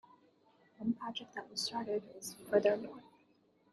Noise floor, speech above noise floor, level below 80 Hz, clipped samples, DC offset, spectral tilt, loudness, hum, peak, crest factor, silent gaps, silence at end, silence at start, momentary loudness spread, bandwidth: -71 dBFS; 34 dB; -80 dBFS; under 0.1%; under 0.1%; -3.5 dB/octave; -37 LUFS; none; -16 dBFS; 24 dB; none; 0.7 s; 0.8 s; 16 LU; 12.5 kHz